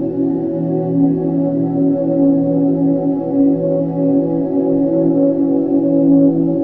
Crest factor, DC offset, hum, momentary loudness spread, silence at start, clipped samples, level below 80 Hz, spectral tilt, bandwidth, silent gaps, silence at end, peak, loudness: 12 dB; 0.1%; none; 5 LU; 0 s; under 0.1%; -52 dBFS; -13.5 dB/octave; 2.1 kHz; none; 0 s; -2 dBFS; -15 LUFS